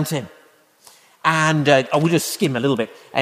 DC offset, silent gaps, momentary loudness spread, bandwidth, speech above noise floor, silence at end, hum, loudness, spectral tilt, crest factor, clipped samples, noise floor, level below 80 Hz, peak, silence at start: under 0.1%; none; 9 LU; 15.5 kHz; 34 dB; 0 s; none; -19 LUFS; -5 dB/octave; 18 dB; under 0.1%; -53 dBFS; -64 dBFS; -2 dBFS; 0 s